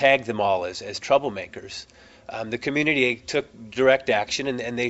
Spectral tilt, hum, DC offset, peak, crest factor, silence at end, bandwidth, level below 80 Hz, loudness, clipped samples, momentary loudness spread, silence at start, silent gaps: -4 dB/octave; none; under 0.1%; -4 dBFS; 20 dB; 0 s; 8.2 kHz; -58 dBFS; -23 LUFS; under 0.1%; 15 LU; 0 s; none